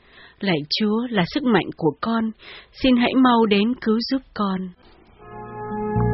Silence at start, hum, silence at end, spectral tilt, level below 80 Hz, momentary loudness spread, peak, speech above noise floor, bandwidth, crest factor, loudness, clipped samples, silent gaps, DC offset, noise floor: 0.4 s; none; 0 s; -4.5 dB/octave; -44 dBFS; 19 LU; -4 dBFS; 20 dB; 6 kHz; 16 dB; -21 LUFS; under 0.1%; none; under 0.1%; -41 dBFS